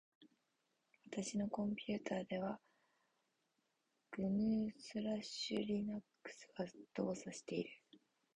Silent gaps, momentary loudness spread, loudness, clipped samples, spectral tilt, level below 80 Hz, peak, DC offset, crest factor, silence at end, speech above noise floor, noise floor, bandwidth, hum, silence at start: none; 13 LU; -43 LUFS; under 0.1%; -5.5 dB/octave; -76 dBFS; -26 dBFS; under 0.1%; 18 dB; 0.4 s; 43 dB; -85 dBFS; 10 kHz; none; 0.2 s